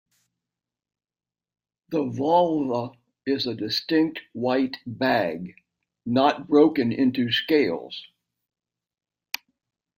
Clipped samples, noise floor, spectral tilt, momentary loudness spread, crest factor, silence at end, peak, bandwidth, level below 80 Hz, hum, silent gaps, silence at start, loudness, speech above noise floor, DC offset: under 0.1%; -78 dBFS; -6 dB/octave; 15 LU; 20 dB; 1.9 s; -6 dBFS; 16 kHz; -68 dBFS; none; none; 1.9 s; -23 LUFS; 55 dB; under 0.1%